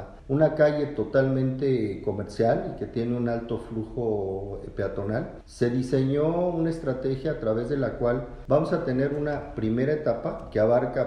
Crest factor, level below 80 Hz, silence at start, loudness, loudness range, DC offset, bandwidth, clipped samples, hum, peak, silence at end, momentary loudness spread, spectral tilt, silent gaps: 18 dB; -46 dBFS; 0 s; -26 LUFS; 4 LU; under 0.1%; 10.5 kHz; under 0.1%; none; -8 dBFS; 0 s; 9 LU; -8.5 dB/octave; none